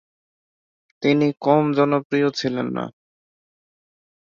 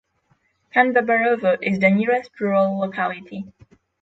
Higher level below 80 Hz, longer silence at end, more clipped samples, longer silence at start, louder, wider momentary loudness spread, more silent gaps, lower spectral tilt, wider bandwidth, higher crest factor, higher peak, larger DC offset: about the same, -66 dBFS vs -64 dBFS; first, 1.35 s vs 0.55 s; neither; first, 1 s vs 0.75 s; about the same, -20 LUFS vs -19 LUFS; second, 9 LU vs 15 LU; first, 2.05-2.10 s vs none; second, -6.5 dB/octave vs -8 dB/octave; about the same, 7.2 kHz vs 7.8 kHz; about the same, 20 dB vs 18 dB; about the same, -4 dBFS vs -2 dBFS; neither